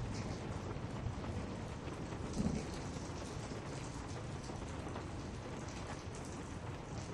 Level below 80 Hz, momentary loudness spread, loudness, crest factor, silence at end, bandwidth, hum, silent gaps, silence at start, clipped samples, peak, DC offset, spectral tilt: -52 dBFS; 5 LU; -44 LUFS; 18 dB; 0 s; 12.5 kHz; none; none; 0 s; under 0.1%; -26 dBFS; under 0.1%; -5.5 dB/octave